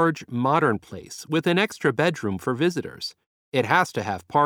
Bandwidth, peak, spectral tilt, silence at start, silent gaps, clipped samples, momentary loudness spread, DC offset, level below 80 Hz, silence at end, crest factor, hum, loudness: 18 kHz; -4 dBFS; -5.5 dB/octave; 0 s; 3.26-3.52 s; under 0.1%; 12 LU; under 0.1%; -62 dBFS; 0 s; 20 dB; none; -24 LUFS